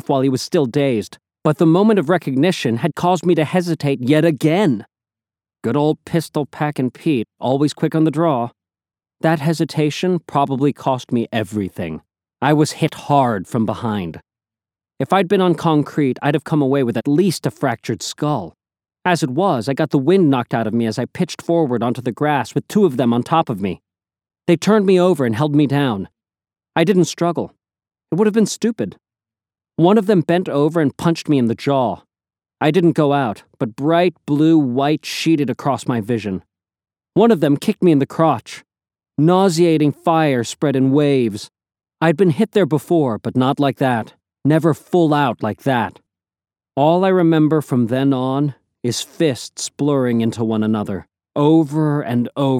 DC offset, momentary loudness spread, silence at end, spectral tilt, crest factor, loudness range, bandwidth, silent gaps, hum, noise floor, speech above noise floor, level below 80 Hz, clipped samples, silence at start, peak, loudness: under 0.1%; 10 LU; 0 s; -6.5 dB/octave; 16 dB; 3 LU; 15.5 kHz; none; none; under -90 dBFS; over 74 dB; -62 dBFS; under 0.1%; 0.1 s; 0 dBFS; -17 LUFS